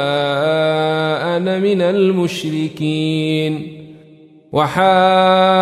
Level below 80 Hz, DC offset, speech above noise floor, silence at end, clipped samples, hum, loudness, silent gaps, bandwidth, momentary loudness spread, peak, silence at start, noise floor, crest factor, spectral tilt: -58 dBFS; under 0.1%; 30 dB; 0 s; under 0.1%; none; -16 LUFS; none; 13.5 kHz; 9 LU; -2 dBFS; 0 s; -44 dBFS; 14 dB; -6 dB/octave